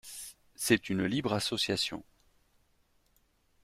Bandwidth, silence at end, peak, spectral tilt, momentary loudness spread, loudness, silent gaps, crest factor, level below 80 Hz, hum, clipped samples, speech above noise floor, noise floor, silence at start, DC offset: 16 kHz; 1.6 s; -10 dBFS; -3.5 dB/octave; 16 LU; -31 LUFS; none; 24 dB; -64 dBFS; none; under 0.1%; 40 dB; -71 dBFS; 0.05 s; under 0.1%